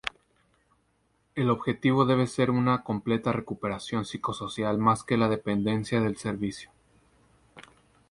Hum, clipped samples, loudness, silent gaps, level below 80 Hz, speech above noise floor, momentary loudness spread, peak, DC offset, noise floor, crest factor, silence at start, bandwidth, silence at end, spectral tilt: none; under 0.1%; -27 LUFS; none; -58 dBFS; 44 dB; 9 LU; -8 dBFS; under 0.1%; -70 dBFS; 20 dB; 0.05 s; 11.5 kHz; 0.5 s; -6.5 dB/octave